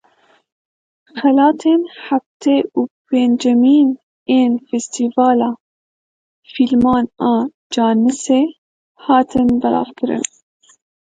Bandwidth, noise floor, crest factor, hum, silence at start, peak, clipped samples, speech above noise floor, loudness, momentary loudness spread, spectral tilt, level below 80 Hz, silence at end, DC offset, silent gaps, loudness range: 9.2 kHz; -55 dBFS; 16 dB; none; 1.15 s; 0 dBFS; under 0.1%; 41 dB; -15 LUFS; 9 LU; -5 dB/octave; -52 dBFS; 0.85 s; under 0.1%; 2.26-2.40 s, 2.90-3.05 s, 4.03-4.26 s, 5.60-6.43 s, 7.54-7.70 s, 8.58-8.95 s; 2 LU